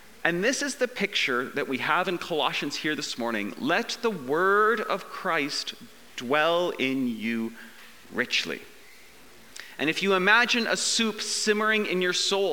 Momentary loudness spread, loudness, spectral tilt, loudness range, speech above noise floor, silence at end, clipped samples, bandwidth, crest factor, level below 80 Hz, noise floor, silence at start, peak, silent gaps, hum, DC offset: 12 LU; -25 LUFS; -2.5 dB/octave; 4 LU; 26 dB; 0 s; under 0.1%; 19.5 kHz; 22 dB; -70 dBFS; -52 dBFS; 0.25 s; -4 dBFS; none; none; 0.3%